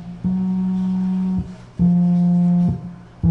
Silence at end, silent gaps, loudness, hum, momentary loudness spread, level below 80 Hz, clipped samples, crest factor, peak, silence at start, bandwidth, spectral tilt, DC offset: 0 s; none; -19 LUFS; none; 10 LU; -40 dBFS; under 0.1%; 10 dB; -8 dBFS; 0 s; 3.2 kHz; -11 dB/octave; under 0.1%